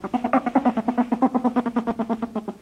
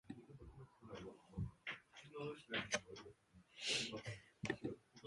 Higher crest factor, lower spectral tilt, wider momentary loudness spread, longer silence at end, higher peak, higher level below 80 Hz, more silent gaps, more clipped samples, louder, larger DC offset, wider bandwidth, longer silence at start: second, 16 dB vs 24 dB; first, -7.5 dB/octave vs -3 dB/octave; second, 6 LU vs 19 LU; about the same, 0.05 s vs 0 s; first, -6 dBFS vs -26 dBFS; first, -56 dBFS vs -68 dBFS; neither; neither; first, -23 LUFS vs -47 LUFS; neither; second, 8.8 kHz vs 11.5 kHz; about the same, 0 s vs 0.05 s